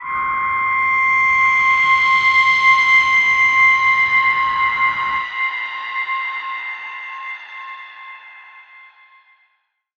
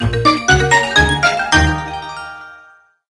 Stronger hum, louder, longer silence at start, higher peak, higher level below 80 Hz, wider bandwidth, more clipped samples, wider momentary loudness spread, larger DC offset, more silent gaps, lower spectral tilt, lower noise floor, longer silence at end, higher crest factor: neither; about the same, -14 LUFS vs -13 LUFS; about the same, 0 s vs 0 s; about the same, -2 dBFS vs 0 dBFS; second, -54 dBFS vs -26 dBFS; second, 8 kHz vs 12 kHz; neither; about the same, 18 LU vs 18 LU; neither; neither; second, -0.5 dB/octave vs -3.5 dB/octave; first, -66 dBFS vs -46 dBFS; first, 1.4 s vs 0.55 s; about the same, 14 dB vs 16 dB